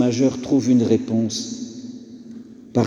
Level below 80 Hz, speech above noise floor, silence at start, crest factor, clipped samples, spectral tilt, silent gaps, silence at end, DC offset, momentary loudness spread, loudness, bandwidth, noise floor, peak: -60 dBFS; 20 dB; 0 s; 16 dB; under 0.1%; -6 dB/octave; none; 0 s; under 0.1%; 22 LU; -20 LUFS; 9.8 kHz; -39 dBFS; -4 dBFS